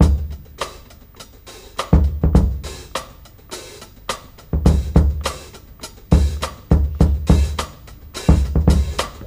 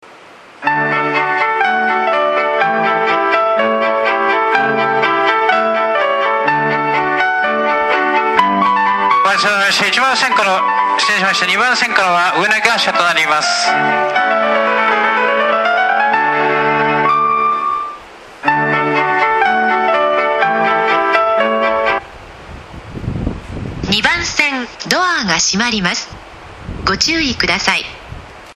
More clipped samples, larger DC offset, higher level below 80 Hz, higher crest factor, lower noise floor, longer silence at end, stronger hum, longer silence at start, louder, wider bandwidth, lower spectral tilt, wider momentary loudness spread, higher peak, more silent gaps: neither; neither; first, -20 dBFS vs -40 dBFS; about the same, 18 dB vs 14 dB; about the same, -42 dBFS vs -39 dBFS; about the same, 0 s vs 0.05 s; neither; about the same, 0 s vs 0.1 s; second, -19 LUFS vs -13 LUFS; about the same, 15.5 kHz vs 15 kHz; first, -6.5 dB/octave vs -3 dB/octave; first, 20 LU vs 9 LU; about the same, 0 dBFS vs 0 dBFS; neither